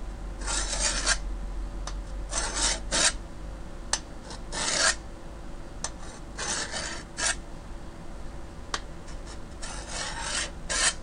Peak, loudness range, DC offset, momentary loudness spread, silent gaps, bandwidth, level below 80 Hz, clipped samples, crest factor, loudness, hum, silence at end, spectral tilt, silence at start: -8 dBFS; 7 LU; under 0.1%; 20 LU; none; 11 kHz; -38 dBFS; under 0.1%; 24 dB; -29 LUFS; none; 0 s; -1 dB/octave; 0 s